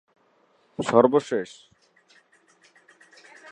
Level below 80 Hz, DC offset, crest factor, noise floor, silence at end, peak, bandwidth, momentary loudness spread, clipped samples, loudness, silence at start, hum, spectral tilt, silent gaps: -68 dBFS; under 0.1%; 24 dB; -63 dBFS; 2.05 s; -2 dBFS; 9.8 kHz; 21 LU; under 0.1%; -22 LUFS; 0.8 s; none; -6 dB/octave; none